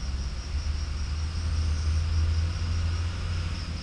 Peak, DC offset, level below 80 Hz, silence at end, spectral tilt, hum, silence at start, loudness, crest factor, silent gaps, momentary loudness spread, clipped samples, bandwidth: -16 dBFS; under 0.1%; -30 dBFS; 0 s; -5.5 dB/octave; none; 0 s; -30 LUFS; 12 dB; none; 6 LU; under 0.1%; 10 kHz